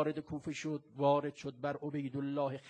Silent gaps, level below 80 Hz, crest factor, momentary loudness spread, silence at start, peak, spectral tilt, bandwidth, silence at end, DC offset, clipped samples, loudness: none; -72 dBFS; 20 dB; 10 LU; 0 s; -18 dBFS; -6.5 dB/octave; 9.4 kHz; 0 s; under 0.1%; under 0.1%; -37 LUFS